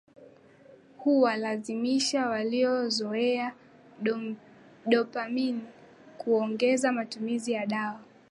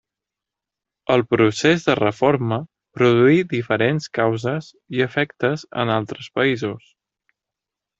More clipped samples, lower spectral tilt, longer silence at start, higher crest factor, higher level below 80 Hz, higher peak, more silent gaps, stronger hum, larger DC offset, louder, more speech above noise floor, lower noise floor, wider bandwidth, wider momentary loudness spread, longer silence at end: neither; second, -4 dB/octave vs -6 dB/octave; second, 0.2 s vs 1.1 s; about the same, 20 dB vs 18 dB; second, -80 dBFS vs -58 dBFS; second, -10 dBFS vs -2 dBFS; neither; neither; neither; second, -28 LUFS vs -20 LUFS; second, 28 dB vs 67 dB; second, -55 dBFS vs -86 dBFS; first, 11.5 kHz vs 8 kHz; about the same, 12 LU vs 12 LU; second, 0.25 s vs 1.2 s